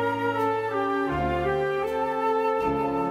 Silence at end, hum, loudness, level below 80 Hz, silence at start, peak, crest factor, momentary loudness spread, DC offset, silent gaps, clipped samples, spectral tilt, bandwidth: 0 s; none; -26 LUFS; -46 dBFS; 0 s; -14 dBFS; 12 dB; 2 LU; under 0.1%; none; under 0.1%; -7 dB/octave; 15.5 kHz